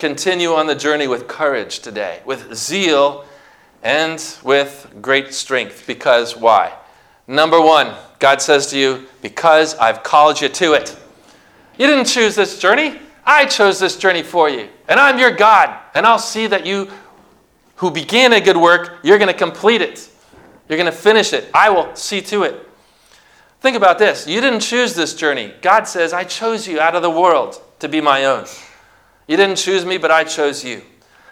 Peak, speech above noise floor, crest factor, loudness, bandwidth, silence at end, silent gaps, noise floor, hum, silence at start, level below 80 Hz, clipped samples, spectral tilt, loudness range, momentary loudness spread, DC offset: 0 dBFS; 38 dB; 16 dB; -14 LUFS; 17 kHz; 0.5 s; none; -52 dBFS; none; 0 s; -62 dBFS; 0.2%; -2.5 dB/octave; 5 LU; 12 LU; under 0.1%